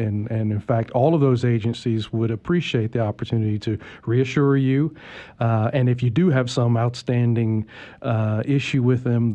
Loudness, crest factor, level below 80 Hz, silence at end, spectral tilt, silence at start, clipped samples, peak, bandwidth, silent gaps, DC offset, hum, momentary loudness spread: -21 LUFS; 14 dB; -54 dBFS; 0 s; -8 dB/octave; 0 s; under 0.1%; -6 dBFS; 8.6 kHz; none; under 0.1%; none; 7 LU